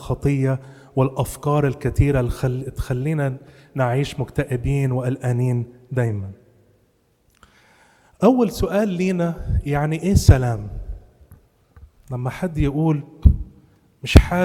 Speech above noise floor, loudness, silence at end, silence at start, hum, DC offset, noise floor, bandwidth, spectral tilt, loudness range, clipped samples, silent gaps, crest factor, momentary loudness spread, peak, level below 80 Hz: 43 dB; -21 LUFS; 0 s; 0 s; none; under 0.1%; -62 dBFS; 16 kHz; -7 dB/octave; 5 LU; under 0.1%; none; 20 dB; 13 LU; 0 dBFS; -28 dBFS